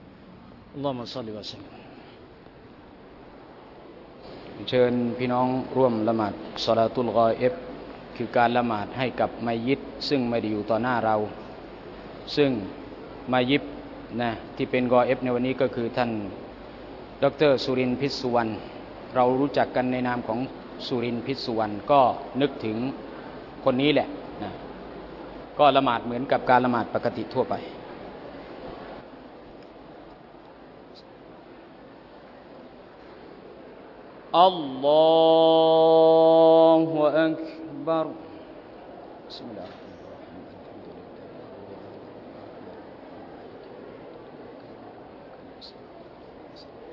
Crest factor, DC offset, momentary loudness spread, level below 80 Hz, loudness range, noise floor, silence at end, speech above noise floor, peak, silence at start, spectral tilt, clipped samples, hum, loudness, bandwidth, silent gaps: 22 dB; under 0.1%; 25 LU; -58 dBFS; 23 LU; -48 dBFS; 0 s; 25 dB; -4 dBFS; 0 s; -7 dB/octave; under 0.1%; none; -23 LUFS; 6 kHz; none